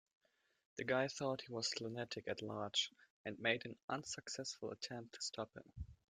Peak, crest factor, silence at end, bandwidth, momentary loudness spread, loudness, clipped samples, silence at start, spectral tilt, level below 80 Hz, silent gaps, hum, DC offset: -22 dBFS; 24 dB; 0.15 s; 13.5 kHz; 11 LU; -43 LUFS; under 0.1%; 0.75 s; -3 dB/octave; -68 dBFS; 3.10-3.24 s, 3.83-3.88 s; none; under 0.1%